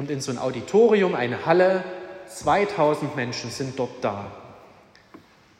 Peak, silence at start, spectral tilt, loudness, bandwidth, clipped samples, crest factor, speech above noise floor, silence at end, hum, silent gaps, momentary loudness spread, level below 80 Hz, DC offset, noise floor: -6 dBFS; 0 s; -5.5 dB/octave; -23 LUFS; 13.5 kHz; under 0.1%; 18 dB; 29 dB; 1 s; none; none; 17 LU; -62 dBFS; under 0.1%; -52 dBFS